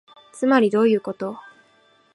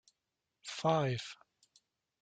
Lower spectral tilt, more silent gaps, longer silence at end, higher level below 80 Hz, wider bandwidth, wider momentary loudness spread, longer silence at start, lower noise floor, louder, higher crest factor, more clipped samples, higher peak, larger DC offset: about the same, -6 dB/octave vs -5.5 dB/octave; neither; second, 0.75 s vs 0.9 s; about the same, -74 dBFS vs -74 dBFS; first, 11.5 kHz vs 9.4 kHz; second, 14 LU vs 19 LU; second, 0.35 s vs 0.65 s; second, -58 dBFS vs -88 dBFS; first, -20 LUFS vs -35 LUFS; about the same, 18 dB vs 20 dB; neither; first, -4 dBFS vs -20 dBFS; neither